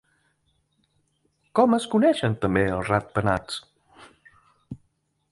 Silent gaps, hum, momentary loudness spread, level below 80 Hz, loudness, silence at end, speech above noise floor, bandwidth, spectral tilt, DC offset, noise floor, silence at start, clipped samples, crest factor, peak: none; none; 23 LU; -50 dBFS; -23 LUFS; 0.55 s; 49 dB; 11.5 kHz; -6.5 dB/octave; under 0.1%; -71 dBFS; 1.55 s; under 0.1%; 22 dB; -4 dBFS